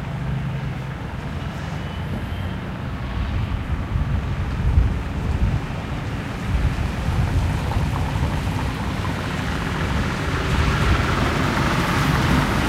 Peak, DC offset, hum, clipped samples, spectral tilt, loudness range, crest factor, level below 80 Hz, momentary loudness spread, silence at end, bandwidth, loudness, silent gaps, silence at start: -4 dBFS; under 0.1%; none; under 0.1%; -6 dB/octave; 6 LU; 18 dB; -26 dBFS; 9 LU; 0 s; 15.5 kHz; -23 LUFS; none; 0 s